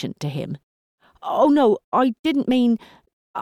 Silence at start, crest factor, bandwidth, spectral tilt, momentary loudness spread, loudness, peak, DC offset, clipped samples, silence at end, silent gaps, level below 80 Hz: 0 s; 14 dB; 12.5 kHz; -7 dB/octave; 18 LU; -20 LUFS; -6 dBFS; under 0.1%; under 0.1%; 0 s; 0.63-0.98 s, 1.84-1.92 s, 2.19-2.24 s, 3.13-3.34 s; -62 dBFS